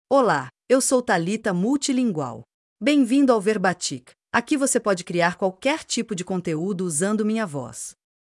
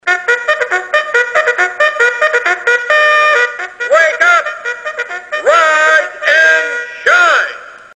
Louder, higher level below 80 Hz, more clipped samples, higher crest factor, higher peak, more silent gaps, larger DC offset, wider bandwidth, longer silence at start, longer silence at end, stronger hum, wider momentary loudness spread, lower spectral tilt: second, -22 LUFS vs -10 LUFS; second, -66 dBFS vs -60 dBFS; neither; first, 18 dB vs 12 dB; second, -4 dBFS vs 0 dBFS; first, 2.54-2.76 s vs none; neither; first, 12 kHz vs 10.5 kHz; about the same, 0.1 s vs 0.05 s; first, 0.3 s vs 0.15 s; neither; about the same, 11 LU vs 12 LU; first, -4.5 dB/octave vs 0.5 dB/octave